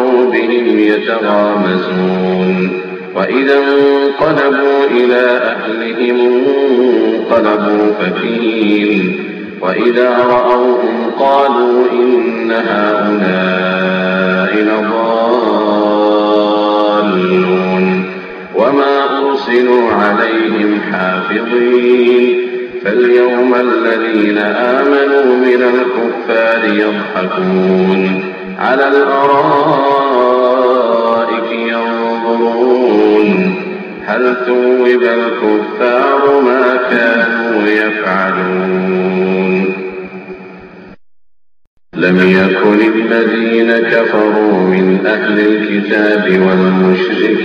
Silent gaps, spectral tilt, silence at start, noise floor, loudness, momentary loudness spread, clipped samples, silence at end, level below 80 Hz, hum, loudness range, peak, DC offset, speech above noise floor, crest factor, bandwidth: 41.67-41.77 s; -8 dB/octave; 0 s; -57 dBFS; -11 LUFS; 6 LU; under 0.1%; 0 s; -56 dBFS; none; 2 LU; 0 dBFS; under 0.1%; 47 dB; 10 dB; 6.4 kHz